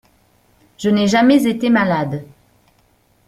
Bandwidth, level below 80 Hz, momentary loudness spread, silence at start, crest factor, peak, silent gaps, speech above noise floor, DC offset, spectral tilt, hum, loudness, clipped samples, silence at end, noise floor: 15 kHz; -56 dBFS; 12 LU; 0.8 s; 16 dB; -2 dBFS; none; 43 dB; under 0.1%; -6 dB/octave; none; -15 LUFS; under 0.1%; 1 s; -57 dBFS